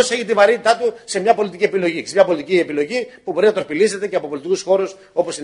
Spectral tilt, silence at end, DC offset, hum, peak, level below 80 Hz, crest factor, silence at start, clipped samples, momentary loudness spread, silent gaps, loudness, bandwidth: -4 dB/octave; 0 s; under 0.1%; none; 0 dBFS; -64 dBFS; 18 dB; 0 s; under 0.1%; 8 LU; none; -18 LUFS; 11 kHz